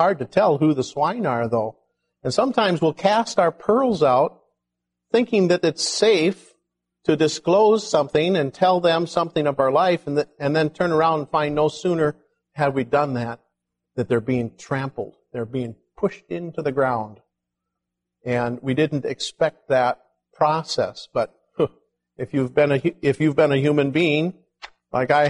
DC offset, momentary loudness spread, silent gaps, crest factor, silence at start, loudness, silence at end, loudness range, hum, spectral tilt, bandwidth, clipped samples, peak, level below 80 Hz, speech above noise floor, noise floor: under 0.1%; 11 LU; none; 18 dB; 0 s; -21 LUFS; 0 s; 7 LU; 60 Hz at -55 dBFS; -5.5 dB/octave; 11.5 kHz; under 0.1%; -4 dBFS; -60 dBFS; 62 dB; -82 dBFS